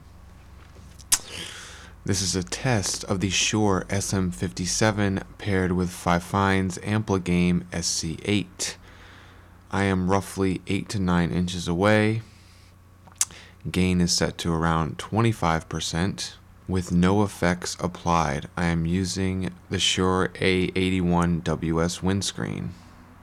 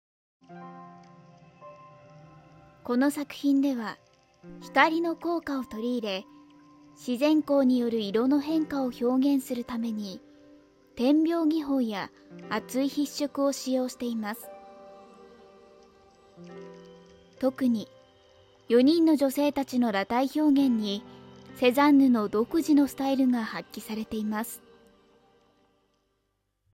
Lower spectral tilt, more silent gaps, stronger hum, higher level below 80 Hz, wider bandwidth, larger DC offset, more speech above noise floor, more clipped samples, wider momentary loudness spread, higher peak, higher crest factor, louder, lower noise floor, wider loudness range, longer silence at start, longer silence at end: about the same, -4.5 dB/octave vs -5 dB/octave; neither; neither; first, -46 dBFS vs -66 dBFS; about the same, 15.5 kHz vs 16 kHz; neither; second, 27 dB vs 51 dB; neither; second, 9 LU vs 22 LU; about the same, -8 dBFS vs -8 dBFS; about the same, 18 dB vs 20 dB; about the same, -25 LUFS vs -26 LUFS; second, -51 dBFS vs -77 dBFS; second, 3 LU vs 10 LU; second, 0.05 s vs 0.5 s; second, 0.1 s vs 2.15 s